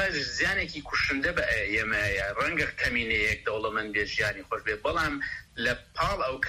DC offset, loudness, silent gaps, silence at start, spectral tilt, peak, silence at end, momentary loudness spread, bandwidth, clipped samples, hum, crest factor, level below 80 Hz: under 0.1%; -28 LUFS; none; 0 s; -3.5 dB/octave; -12 dBFS; 0 s; 4 LU; 15.5 kHz; under 0.1%; none; 16 dB; -46 dBFS